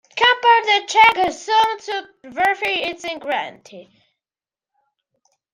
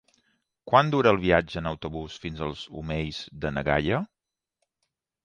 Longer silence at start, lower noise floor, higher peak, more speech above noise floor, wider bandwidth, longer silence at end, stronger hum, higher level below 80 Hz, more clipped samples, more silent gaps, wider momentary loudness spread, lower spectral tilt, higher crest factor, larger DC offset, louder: second, 0.15 s vs 0.65 s; first, under -90 dBFS vs -81 dBFS; about the same, -2 dBFS vs -4 dBFS; first, over 71 dB vs 55 dB; first, 15.5 kHz vs 9.6 kHz; first, 1.75 s vs 1.2 s; neither; second, -60 dBFS vs -46 dBFS; neither; neither; about the same, 15 LU vs 14 LU; second, -1 dB/octave vs -6.5 dB/octave; second, 18 dB vs 24 dB; neither; first, -17 LUFS vs -26 LUFS